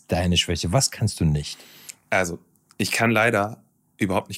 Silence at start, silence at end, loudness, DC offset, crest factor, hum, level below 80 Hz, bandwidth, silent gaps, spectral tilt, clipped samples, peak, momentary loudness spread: 0.1 s; 0 s; -22 LUFS; under 0.1%; 16 dB; none; -46 dBFS; 16 kHz; none; -4 dB/octave; under 0.1%; -8 dBFS; 17 LU